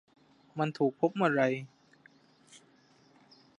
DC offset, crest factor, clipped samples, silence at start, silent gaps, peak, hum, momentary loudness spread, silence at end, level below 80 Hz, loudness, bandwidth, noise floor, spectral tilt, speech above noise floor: under 0.1%; 22 dB; under 0.1%; 0.55 s; none; -12 dBFS; none; 15 LU; 1.05 s; -84 dBFS; -30 LUFS; 11 kHz; -64 dBFS; -7 dB/octave; 34 dB